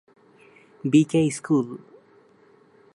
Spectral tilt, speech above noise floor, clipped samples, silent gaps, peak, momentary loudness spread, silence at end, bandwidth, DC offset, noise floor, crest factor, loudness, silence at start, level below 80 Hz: -6.5 dB/octave; 35 dB; under 0.1%; none; -6 dBFS; 15 LU; 1.2 s; 11.5 kHz; under 0.1%; -56 dBFS; 20 dB; -22 LUFS; 0.85 s; -68 dBFS